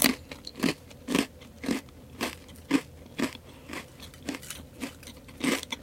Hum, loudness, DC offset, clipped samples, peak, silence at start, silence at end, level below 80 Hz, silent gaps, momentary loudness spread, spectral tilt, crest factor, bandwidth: none; -33 LUFS; under 0.1%; under 0.1%; -2 dBFS; 0 s; 0 s; -56 dBFS; none; 15 LU; -3 dB/octave; 32 dB; 17 kHz